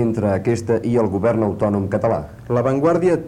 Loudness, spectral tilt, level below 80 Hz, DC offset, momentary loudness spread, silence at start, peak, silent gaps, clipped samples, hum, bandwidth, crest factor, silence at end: -19 LUFS; -8.5 dB/octave; -46 dBFS; under 0.1%; 4 LU; 0 s; -6 dBFS; none; under 0.1%; none; 12 kHz; 12 dB; 0 s